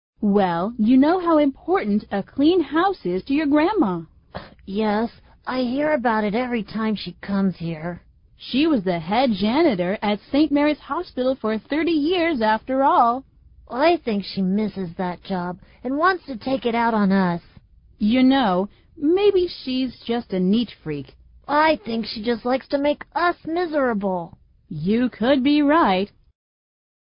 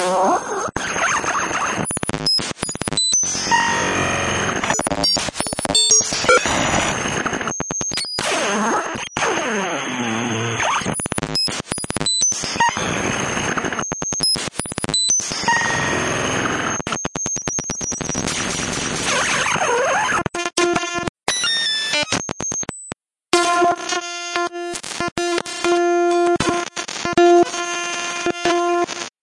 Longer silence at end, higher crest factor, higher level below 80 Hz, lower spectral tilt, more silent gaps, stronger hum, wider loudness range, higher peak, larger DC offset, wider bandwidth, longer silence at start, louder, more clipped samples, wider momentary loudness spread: first, 1.05 s vs 0.15 s; about the same, 16 dB vs 20 dB; second, -52 dBFS vs -46 dBFS; first, -11 dB/octave vs -2 dB/octave; second, none vs 21.09-21.15 s, 25.12-25.16 s; neither; about the same, 3 LU vs 4 LU; second, -4 dBFS vs 0 dBFS; neither; second, 5.4 kHz vs 11.5 kHz; first, 0.2 s vs 0 s; about the same, -21 LUFS vs -19 LUFS; neither; first, 12 LU vs 8 LU